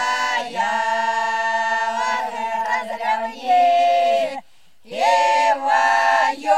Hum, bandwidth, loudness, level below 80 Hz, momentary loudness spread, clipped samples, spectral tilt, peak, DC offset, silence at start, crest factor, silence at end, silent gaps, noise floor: none; 13.5 kHz; -19 LUFS; -76 dBFS; 8 LU; under 0.1%; -1 dB/octave; -4 dBFS; 0.5%; 0 s; 14 dB; 0 s; none; -53 dBFS